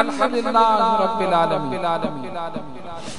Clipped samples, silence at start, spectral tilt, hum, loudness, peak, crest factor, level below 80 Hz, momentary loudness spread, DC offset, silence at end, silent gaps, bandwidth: under 0.1%; 0 s; -5.5 dB/octave; none; -20 LUFS; -2 dBFS; 20 dB; -54 dBFS; 15 LU; 2%; 0 s; none; 11 kHz